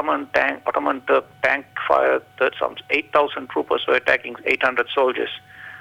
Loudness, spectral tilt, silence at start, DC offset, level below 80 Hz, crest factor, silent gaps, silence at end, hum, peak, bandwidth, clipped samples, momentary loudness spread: -21 LUFS; -4.5 dB/octave; 0 s; under 0.1%; -60 dBFS; 18 dB; none; 0 s; none; -4 dBFS; 16 kHz; under 0.1%; 7 LU